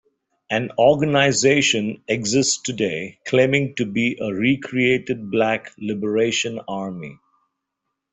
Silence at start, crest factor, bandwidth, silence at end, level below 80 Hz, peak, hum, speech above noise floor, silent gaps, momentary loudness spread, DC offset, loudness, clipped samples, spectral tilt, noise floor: 0.5 s; 18 dB; 8.4 kHz; 1 s; -58 dBFS; -2 dBFS; none; 59 dB; none; 12 LU; under 0.1%; -20 LUFS; under 0.1%; -4 dB/octave; -79 dBFS